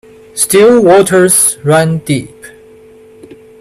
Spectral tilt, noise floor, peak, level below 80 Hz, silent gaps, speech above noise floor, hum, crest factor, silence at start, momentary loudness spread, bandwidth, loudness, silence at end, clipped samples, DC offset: -4 dB/octave; -38 dBFS; 0 dBFS; -48 dBFS; none; 30 dB; none; 10 dB; 0.35 s; 11 LU; 16.5 kHz; -8 LUFS; 1.1 s; under 0.1%; under 0.1%